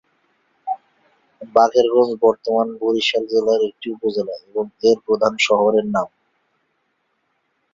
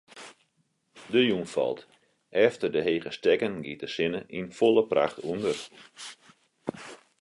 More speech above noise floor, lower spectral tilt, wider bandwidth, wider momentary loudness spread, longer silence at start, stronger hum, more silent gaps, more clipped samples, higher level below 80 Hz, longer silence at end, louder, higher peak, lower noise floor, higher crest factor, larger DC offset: first, 51 dB vs 46 dB; about the same, -4 dB/octave vs -5 dB/octave; second, 7.6 kHz vs 11.5 kHz; second, 13 LU vs 20 LU; first, 0.65 s vs 0.15 s; neither; neither; neither; first, -62 dBFS vs -68 dBFS; first, 1.65 s vs 0.3 s; first, -18 LUFS vs -27 LUFS; first, 0 dBFS vs -8 dBFS; second, -69 dBFS vs -73 dBFS; about the same, 20 dB vs 20 dB; neither